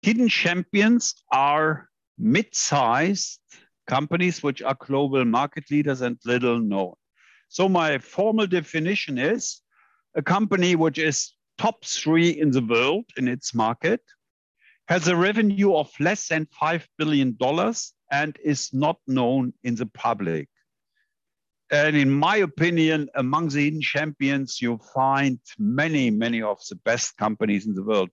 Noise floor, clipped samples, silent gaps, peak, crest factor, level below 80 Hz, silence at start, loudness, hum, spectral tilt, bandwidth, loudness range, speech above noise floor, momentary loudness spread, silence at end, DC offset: -79 dBFS; under 0.1%; 2.07-2.15 s, 14.30-14.55 s; -8 dBFS; 16 dB; -68 dBFS; 0.05 s; -23 LUFS; none; -4.5 dB/octave; 8.2 kHz; 3 LU; 57 dB; 7 LU; 0.05 s; under 0.1%